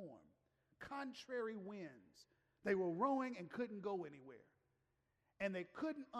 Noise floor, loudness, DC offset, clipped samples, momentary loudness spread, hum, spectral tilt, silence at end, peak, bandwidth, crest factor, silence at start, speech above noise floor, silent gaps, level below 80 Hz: -85 dBFS; -45 LUFS; under 0.1%; under 0.1%; 19 LU; none; -6.5 dB/octave; 0 s; -26 dBFS; 12 kHz; 20 dB; 0 s; 40 dB; none; -82 dBFS